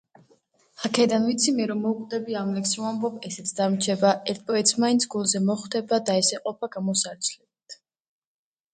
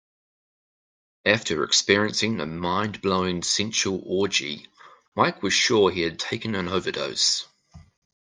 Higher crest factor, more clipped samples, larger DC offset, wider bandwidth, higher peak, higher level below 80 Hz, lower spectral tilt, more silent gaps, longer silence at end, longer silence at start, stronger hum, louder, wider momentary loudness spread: about the same, 20 dB vs 24 dB; neither; neither; about the same, 9.6 kHz vs 10.5 kHz; second, -6 dBFS vs -2 dBFS; second, -72 dBFS vs -62 dBFS; about the same, -3.5 dB/octave vs -3 dB/octave; second, none vs 5.08-5.12 s; first, 1 s vs 0.4 s; second, 0.8 s vs 1.25 s; neither; about the same, -24 LUFS vs -23 LUFS; about the same, 9 LU vs 8 LU